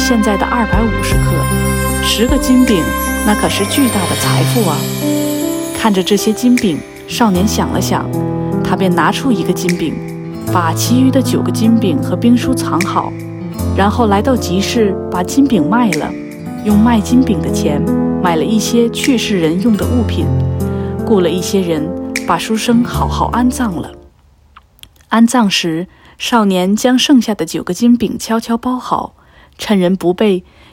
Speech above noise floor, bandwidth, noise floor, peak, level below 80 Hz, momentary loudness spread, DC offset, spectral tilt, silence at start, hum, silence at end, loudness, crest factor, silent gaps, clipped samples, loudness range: 34 dB; 17 kHz; -46 dBFS; 0 dBFS; -30 dBFS; 8 LU; under 0.1%; -5 dB/octave; 0 s; none; 0.3 s; -13 LUFS; 12 dB; none; under 0.1%; 3 LU